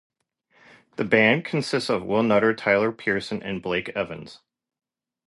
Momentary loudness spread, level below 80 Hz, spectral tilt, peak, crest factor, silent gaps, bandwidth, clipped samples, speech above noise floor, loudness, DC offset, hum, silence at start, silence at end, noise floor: 12 LU; -60 dBFS; -5.5 dB/octave; -4 dBFS; 22 dB; none; 11.5 kHz; under 0.1%; 42 dB; -23 LUFS; under 0.1%; none; 1 s; 0.9 s; -65 dBFS